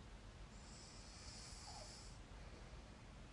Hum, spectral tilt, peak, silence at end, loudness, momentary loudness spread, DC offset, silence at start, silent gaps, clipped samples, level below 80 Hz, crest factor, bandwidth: none; -3.5 dB/octave; -42 dBFS; 0 s; -57 LUFS; 5 LU; under 0.1%; 0 s; none; under 0.1%; -60 dBFS; 14 dB; 11.5 kHz